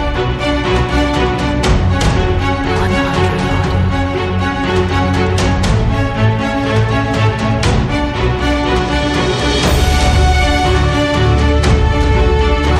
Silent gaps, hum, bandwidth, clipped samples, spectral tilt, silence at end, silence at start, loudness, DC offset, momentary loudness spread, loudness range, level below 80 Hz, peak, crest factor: none; none; 15 kHz; under 0.1%; -6 dB/octave; 0 s; 0 s; -14 LUFS; under 0.1%; 3 LU; 2 LU; -18 dBFS; 0 dBFS; 12 dB